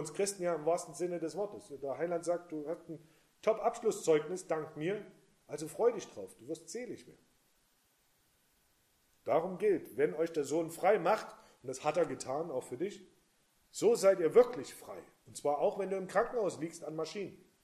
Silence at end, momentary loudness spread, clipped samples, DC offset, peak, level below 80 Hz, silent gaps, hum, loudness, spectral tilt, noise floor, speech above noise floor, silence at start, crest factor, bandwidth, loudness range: 0.3 s; 17 LU; under 0.1%; under 0.1%; -14 dBFS; -76 dBFS; none; none; -34 LUFS; -4.5 dB/octave; -73 dBFS; 39 dB; 0 s; 22 dB; 15 kHz; 8 LU